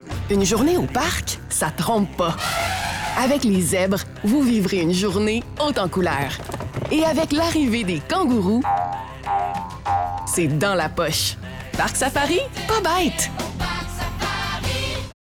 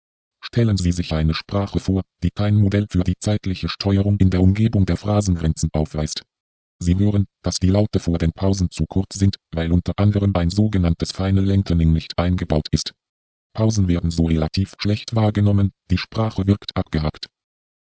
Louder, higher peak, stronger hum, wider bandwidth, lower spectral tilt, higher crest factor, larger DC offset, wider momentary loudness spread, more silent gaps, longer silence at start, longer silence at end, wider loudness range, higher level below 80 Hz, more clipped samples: about the same, -21 LUFS vs -20 LUFS; second, -10 dBFS vs -2 dBFS; neither; first, over 20 kHz vs 8 kHz; second, -4.5 dB/octave vs -6.5 dB/octave; about the same, 12 dB vs 16 dB; neither; about the same, 7 LU vs 7 LU; second, none vs 6.40-6.79 s, 13.09-13.50 s; second, 0 s vs 0.45 s; second, 0.25 s vs 0.6 s; about the same, 2 LU vs 2 LU; second, -38 dBFS vs -30 dBFS; neither